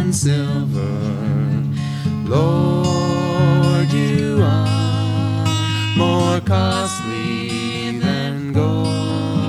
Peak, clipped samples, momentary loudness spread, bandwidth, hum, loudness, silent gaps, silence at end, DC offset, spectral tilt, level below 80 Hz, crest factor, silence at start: -2 dBFS; under 0.1%; 6 LU; 13 kHz; none; -18 LUFS; none; 0 s; under 0.1%; -6 dB/octave; -48 dBFS; 14 dB; 0 s